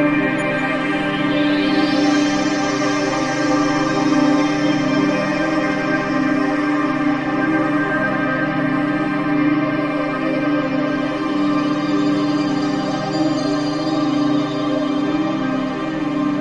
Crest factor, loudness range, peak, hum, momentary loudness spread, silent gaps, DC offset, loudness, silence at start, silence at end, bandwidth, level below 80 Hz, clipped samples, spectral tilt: 14 dB; 2 LU; -4 dBFS; none; 4 LU; none; under 0.1%; -18 LUFS; 0 s; 0 s; 10 kHz; -48 dBFS; under 0.1%; -5.5 dB/octave